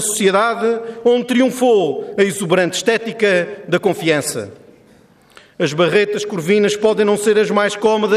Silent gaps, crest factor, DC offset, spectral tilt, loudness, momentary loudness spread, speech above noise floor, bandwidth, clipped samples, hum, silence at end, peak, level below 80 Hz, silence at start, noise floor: none; 14 dB; under 0.1%; -4 dB/octave; -16 LUFS; 6 LU; 33 dB; 15 kHz; under 0.1%; none; 0 s; -2 dBFS; -62 dBFS; 0 s; -49 dBFS